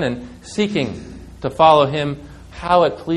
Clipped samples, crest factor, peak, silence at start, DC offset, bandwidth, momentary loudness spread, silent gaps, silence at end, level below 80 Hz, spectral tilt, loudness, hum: under 0.1%; 18 dB; 0 dBFS; 0 s; under 0.1%; 11.5 kHz; 21 LU; none; 0 s; -44 dBFS; -6 dB/octave; -17 LUFS; none